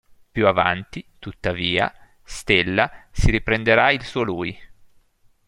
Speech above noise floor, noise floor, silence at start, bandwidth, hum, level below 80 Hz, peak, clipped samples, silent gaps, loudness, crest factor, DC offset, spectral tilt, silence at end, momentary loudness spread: 37 dB; -57 dBFS; 0.35 s; 12.5 kHz; none; -34 dBFS; -2 dBFS; under 0.1%; none; -20 LUFS; 20 dB; under 0.1%; -5 dB/octave; 0.8 s; 16 LU